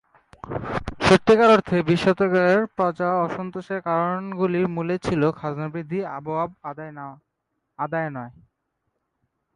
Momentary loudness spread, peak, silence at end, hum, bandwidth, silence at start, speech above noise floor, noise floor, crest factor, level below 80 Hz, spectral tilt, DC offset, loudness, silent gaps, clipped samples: 18 LU; -4 dBFS; 1.25 s; none; 11.5 kHz; 0.45 s; 55 dB; -77 dBFS; 18 dB; -50 dBFS; -6.5 dB/octave; under 0.1%; -22 LUFS; none; under 0.1%